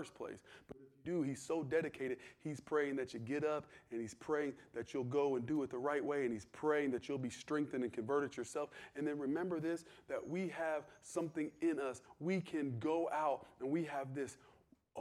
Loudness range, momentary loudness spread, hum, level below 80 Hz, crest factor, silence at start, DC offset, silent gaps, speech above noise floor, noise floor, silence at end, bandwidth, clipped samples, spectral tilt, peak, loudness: 3 LU; 10 LU; none; -78 dBFS; 18 dB; 0 s; under 0.1%; none; 26 dB; -66 dBFS; 0 s; 12.5 kHz; under 0.1%; -6 dB/octave; -22 dBFS; -41 LUFS